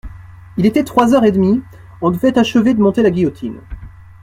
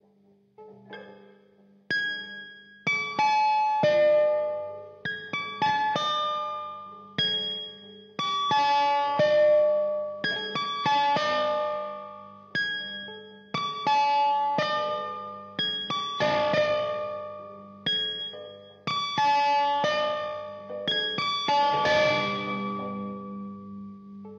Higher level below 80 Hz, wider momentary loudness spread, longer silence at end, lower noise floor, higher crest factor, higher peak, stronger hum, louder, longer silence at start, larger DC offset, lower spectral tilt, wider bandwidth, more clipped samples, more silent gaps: first, -40 dBFS vs -70 dBFS; about the same, 16 LU vs 18 LU; first, 0.35 s vs 0 s; second, -35 dBFS vs -62 dBFS; about the same, 14 dB vs 14 dB; first, 0 dBFS vs -12 dBFS; second, none vs 50 Hz at -60 dBFS; first, -14 LUFS vs -26 LUFS; second, 0.05 s vs 0.6 s; neither; first, -7 dB/octave vs -4 dB/octave; first, 15.5 kHz vs 7.2 kHz; neither; neither